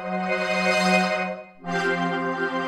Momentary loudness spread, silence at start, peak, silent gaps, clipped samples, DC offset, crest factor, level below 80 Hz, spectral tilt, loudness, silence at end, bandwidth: 9 LU; 0 s; -6 dBFS; none; under 0.1%; under 0.1%; 18 dB; -62 dBFS; -4.5 dB/octave; -23 LUFS; 0 s; 13.5 kHz